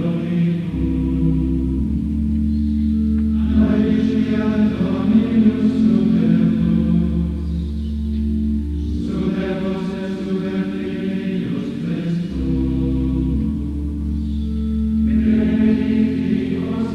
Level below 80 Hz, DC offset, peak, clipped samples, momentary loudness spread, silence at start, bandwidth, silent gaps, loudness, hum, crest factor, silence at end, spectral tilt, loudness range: -26 dBFS; under 0.1%; -4 dBFS; under 0.1%; 8 LU; 0 s; 6.2 kHz; none; -19 LUFS; none; 14 dB; 0 s; -9.5 dB/octave; 6 LU